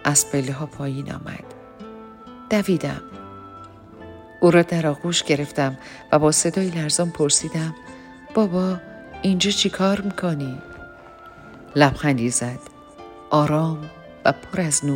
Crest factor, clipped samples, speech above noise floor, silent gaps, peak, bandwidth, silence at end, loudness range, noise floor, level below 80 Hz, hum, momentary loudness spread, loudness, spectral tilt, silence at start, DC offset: 20 dB; under 0.1%; 22 dB; none; -2 dBFS; 16.5 kHz; 0 s; 6 LU; -43 dBFS; -52 dBFS; none; 23 LU; -21 LUFS; -4 dB/octave; 0 s; under 0.1%